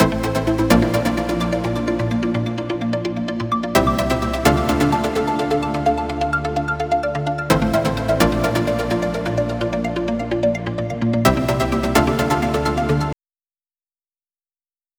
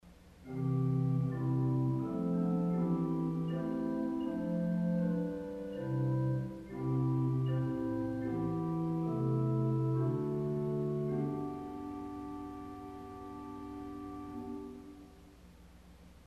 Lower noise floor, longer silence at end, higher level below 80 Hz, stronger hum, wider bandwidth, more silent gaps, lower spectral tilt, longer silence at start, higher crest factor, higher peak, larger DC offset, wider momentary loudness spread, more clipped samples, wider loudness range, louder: first, under -90 dBFS vs -57 dBFS; first, 1.85 s vs 0.05 s; first, -34 dBFS vs -60 dBFS; neither; first, over 20 kHz vs 5.6 kHz; neither; second, -6 dB/octave vs -10 dB/octave; about the same, 0 s vs 0.05 s; first, 20 dB vs 12 dB; first, 0 dBFS vs -22 dBFS; neither; second, 6 LU vs 13 LU; neither; second, 2 LU vs 11 LU; first, -20 LUFS vs -35 LUFS